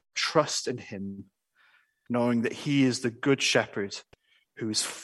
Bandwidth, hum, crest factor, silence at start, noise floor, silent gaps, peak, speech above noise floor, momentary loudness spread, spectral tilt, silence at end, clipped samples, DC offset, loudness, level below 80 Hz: 12.5 kHz; none; 22 dB; 0.15 s; -65 dBFS; none; -8 dBFS; 37 dB; 14 LU; -4 dB/octave; 0 s; under 0.1%; under 0.1%; -28 LUFS; -72 dBFS